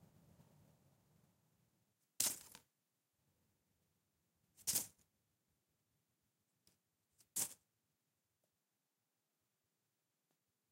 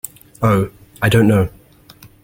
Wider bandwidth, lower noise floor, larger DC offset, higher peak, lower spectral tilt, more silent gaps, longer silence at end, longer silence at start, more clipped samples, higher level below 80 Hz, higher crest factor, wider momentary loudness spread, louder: about the same, 16 kHz vs 17 kHz; first, -89 dBFS vs -44 dBFS; neither; second, -16 dBFS vs -2 dBFS; second, 0 dB/octave vs -6.5 dB/octave; neither; first, 3.15 s vs 0.75 s; first, 2.2 s vs 0.4 s; neither; second, -88 dBFS vs -40 dBFS; first, 38 dB vs 16 dB; about the same, 12 LU vs 12 LU; second, -42 LUFS vs -16 LUFS